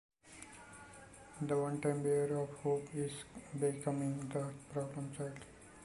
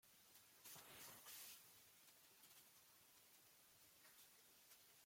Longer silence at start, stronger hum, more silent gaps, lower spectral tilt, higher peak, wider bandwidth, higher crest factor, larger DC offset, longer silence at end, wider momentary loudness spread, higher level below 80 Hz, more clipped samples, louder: first, 0.25 s vs 0.05 s; neither; neither; first, -6.5 dB/octave vs -0.5 dB/octave; first, -22 dBFS vs -48 dBFS; second, 11.5 kHz vs 16.5 kHz; about the same, 18 dB vs 20 dB; neither; about the same, 0 s vs 0 s; first, 19 LU vs 11 LU; first, -70 dBFS vs under -90 dBFS; neither; first, -39 LUFS vs -64 LUFS